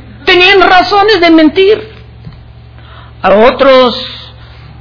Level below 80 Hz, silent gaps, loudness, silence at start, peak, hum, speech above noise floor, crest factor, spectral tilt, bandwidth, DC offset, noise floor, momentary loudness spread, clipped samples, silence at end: -34 dBFS; none; -6 LUFS; 0.05 s; 0 dBFS; none; 26 dB; 8 dB; -5.5 dB/octave; 5.4 kHz; under 0.1%; -32 dBFS; 11 LU; 4%; 0.55 s